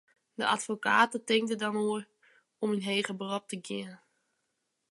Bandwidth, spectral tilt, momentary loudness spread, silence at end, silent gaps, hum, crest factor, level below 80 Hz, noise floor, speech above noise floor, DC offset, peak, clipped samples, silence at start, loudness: 11.5 kHz; -3.5 dB/octave; 13 LU; 0.95 s; none; none; 22 dB; -84 dBFS; -81 dBFS; 50 dB; under 0.1%; -10 dBFS; under 0.1%; 0.4 s; -30 LUFS